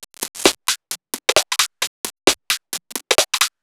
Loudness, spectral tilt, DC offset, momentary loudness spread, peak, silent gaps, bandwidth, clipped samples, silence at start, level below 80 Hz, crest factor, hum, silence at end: -19 LUFS; 0 dB/octave; under 0.1%; 10 LU; 0 dBFS; 1.87-2.04 s; over 20 kHz; under 0.1%; 0 s; -54 dBFS; 22 dB; none; 0.15 s